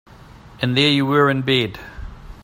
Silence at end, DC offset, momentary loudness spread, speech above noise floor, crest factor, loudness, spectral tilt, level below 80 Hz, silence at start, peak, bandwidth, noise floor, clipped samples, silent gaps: 0.05 s; under 0.1%; 21 LU; 25 dB; 18 dB; -17 LUFS; -6 dB/octave; -42 dBFS; 0.35 s; -2 dBFS; 16 kHz; -43 dBFS; under 0.1%; none